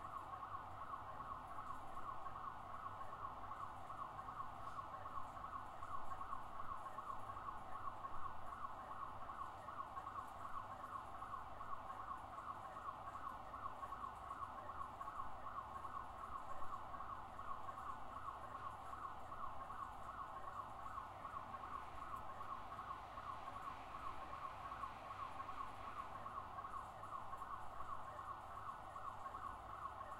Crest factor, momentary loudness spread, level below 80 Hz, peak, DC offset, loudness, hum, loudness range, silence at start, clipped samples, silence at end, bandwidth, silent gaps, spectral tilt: 16 dB; 1 LU; -66 dBFS; -34 dBFS; under 0.1%; -51 LUFS; none; 1 LU; 0 s; under 0.1%; 0 s; 16 kHz; none; -5 dB/octave